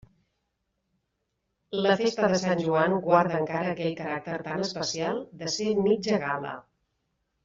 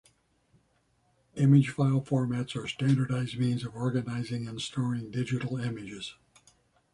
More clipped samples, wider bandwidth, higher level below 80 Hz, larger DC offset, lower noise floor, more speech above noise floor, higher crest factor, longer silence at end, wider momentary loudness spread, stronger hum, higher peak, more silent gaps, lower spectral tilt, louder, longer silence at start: neither; second, 7.8 kHz vs 11 kHz; about the same, -66 dBFS vs -64 dBFS; neither; first, -79 dBFS vs -70 dBFS; first, 53 dB vs 42 dB; about the same, 20 dB vs 20 dB; about the same, 0.85 s vs 0.8 s; second, 10 LU vs 13 LU; neither; about the same, -8 dBFS vs -10 dBFS; neither; second, -5 dB/octave vs -7 dB/octave; about the same, -27 LUFS vs -29 LUFS; first, 1.7 s vs 1.35 s